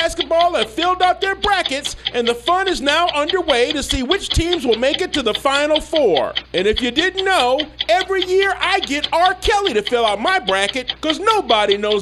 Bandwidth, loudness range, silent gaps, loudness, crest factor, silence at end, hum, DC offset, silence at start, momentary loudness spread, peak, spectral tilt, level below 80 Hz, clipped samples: 13.5 kHz; 1 LU; none; -17 LUFS; 16 dB; 0 s; none; under 0.1%; 0 s; 3 LU; 0 dBFS; -3 dB/octave; -36 dBFS; under 0.1%